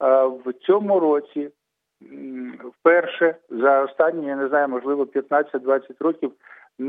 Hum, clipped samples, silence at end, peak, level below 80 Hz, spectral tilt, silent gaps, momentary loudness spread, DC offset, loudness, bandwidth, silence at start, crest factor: none; under 0.1%; 0 s; -2 dBFS; -86 dBFS; -8.5 dB/octave; none; 16 LU; under 0.1%; -21 LUFS; 4.5 kHz; 0 s; 18 dB